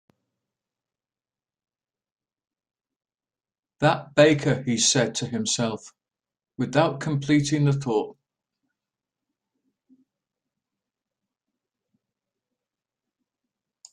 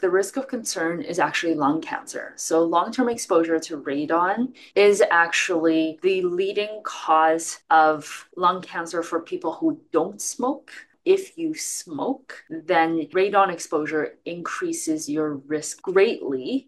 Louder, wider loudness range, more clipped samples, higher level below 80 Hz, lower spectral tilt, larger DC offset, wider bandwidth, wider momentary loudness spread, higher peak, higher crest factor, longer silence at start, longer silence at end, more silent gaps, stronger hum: about the same, -23 LUFS vs -23 LUFS; about the same, 7 LU vs 5 LU; neither; first, -64 dBFS vs -76 dBFS; about the same, -4.5 dB/octave vs -3.5 dB/octave; neither; second, 11 kHz vs 12.5 kHz; about the same, 10 LU vs 11 LU; about the same, -6 dBFS vs -4 dBFS; first, 24 dB vs 18 dB; first, 3.8 s vs 0 s; first, 5.8 s vs 0.05 s; neither; neither